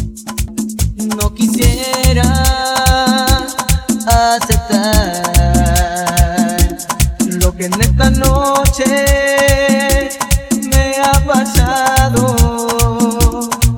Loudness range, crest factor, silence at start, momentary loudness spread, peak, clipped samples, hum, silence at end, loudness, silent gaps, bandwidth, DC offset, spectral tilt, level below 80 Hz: 1 LU; 12 dB; 0 s; 5 LU; 0 dBFS; under 0.1%; none; 0 s; -13 LUFS; none; over 20 kHz; under 0.1%; -4.5 dB/octave; -16 dBFS